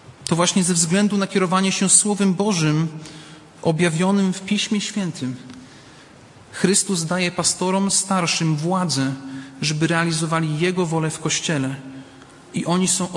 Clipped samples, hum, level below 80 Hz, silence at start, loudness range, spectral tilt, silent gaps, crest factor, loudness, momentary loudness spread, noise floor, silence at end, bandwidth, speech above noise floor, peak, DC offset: under 0.1%; none; -60 dBFS; 0.05 s; 5 LU; -4 dB/octave; none; 20 dB; -20 LUFS; 13 LU; -45 dBFS; 0 s; 11.5 kHz; 26 dB; -2 dBFS; under 0.1%